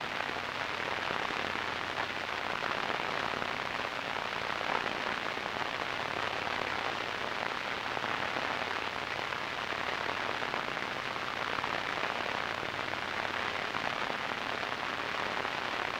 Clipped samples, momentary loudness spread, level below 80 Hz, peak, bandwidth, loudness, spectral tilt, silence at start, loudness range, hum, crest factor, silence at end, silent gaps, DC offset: under 0.1%; 2 LU; -64 dBFS; -14 dBFS; 16 kHz; -34 LUFS; -3 dB/octave; 0 s; 0 LU; none; 22 dB; 0 s; none; under 0.1%